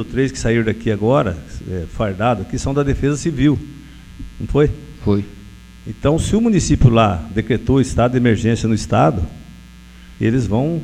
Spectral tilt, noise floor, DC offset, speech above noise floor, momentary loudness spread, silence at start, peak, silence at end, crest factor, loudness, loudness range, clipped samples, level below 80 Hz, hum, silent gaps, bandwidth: -6.5 dB/octave; -40 dBFS; under 0.1%; 23 dB; 13 LU; 0 s; 0 dBFS; 0 s; 18 dB; -17 LUFS; 5 LU; under 0.1%; -30 dBFS; none; none; 11 kHz